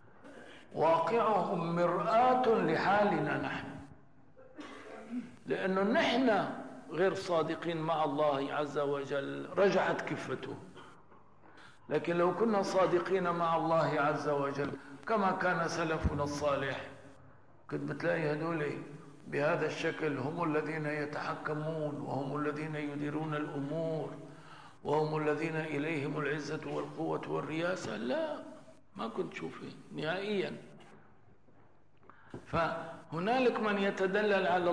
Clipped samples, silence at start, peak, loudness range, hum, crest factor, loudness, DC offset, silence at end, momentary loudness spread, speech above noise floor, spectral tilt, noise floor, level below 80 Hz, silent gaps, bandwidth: under 0.1%; 0.25 s; -18 dBFS; 7 LU; none; 16 dB; -33 LUFS; 0.1%; 0 s; 15 LU; 33 dB; -6 dB/octave; -65 dBFS; -60 dBFS; none; 11 kHz